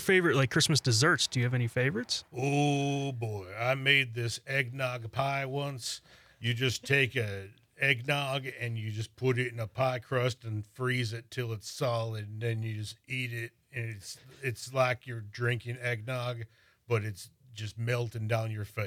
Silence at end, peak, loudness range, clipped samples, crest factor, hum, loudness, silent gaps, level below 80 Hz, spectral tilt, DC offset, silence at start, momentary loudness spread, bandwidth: 0 s; -8 dBFS; 6 LU; under 0.1%; 24 dB; none; -31 LUFS; none; -70 dBFS; -4.5 dB/octave; under 0.1%; 0 s; 14 LU; 15.5 kHz